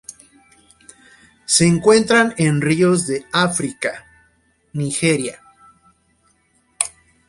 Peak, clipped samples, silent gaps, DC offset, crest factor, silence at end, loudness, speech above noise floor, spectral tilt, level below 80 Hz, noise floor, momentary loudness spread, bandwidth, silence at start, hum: 0 dBFS; under 0.1%; none; under 0.1%; 20 dB; 0.4 s; -17 LUFS; 44 dB; -4 dB/octave; -54 dBFS; -61 dBFS; 15 LU; 11.5 kHz; 0.1 s; none